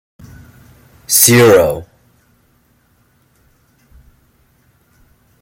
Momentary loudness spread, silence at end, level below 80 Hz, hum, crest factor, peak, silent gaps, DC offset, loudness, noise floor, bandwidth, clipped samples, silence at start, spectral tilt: 12 LU; 3.6 s; -48 dBFS; none; 18 dB; 0 dBFS; none; under 0.1%; -9 LUFS; -56 dBFS; 17 kHz; under 0.1%; 1.1 s; -3.5 dB/octave